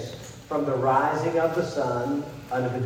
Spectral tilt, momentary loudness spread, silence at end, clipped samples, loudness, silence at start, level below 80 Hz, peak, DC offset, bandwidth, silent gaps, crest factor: -6.5 dB/octave; 9 LU; 0 s; under 0.1%; -26 LUFS; 0 s; -58 dBFS; -10 dBFS; under 0.1%; 16.5 kHz; none; 16 dB